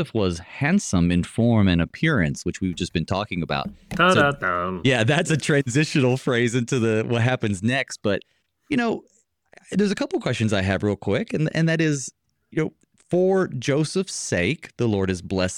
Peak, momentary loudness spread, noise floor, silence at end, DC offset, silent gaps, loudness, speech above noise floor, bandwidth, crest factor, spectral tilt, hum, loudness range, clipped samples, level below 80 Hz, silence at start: -4 dBFS; 8 LU; -55 dBFS; 0 s; under 0.1%; none; -22 LUFS; 34 dB; 12 kHz; 18 dB; -5.5 dB/octave; none; 4 LU; under 0.1%; -48 dBFS; 0 s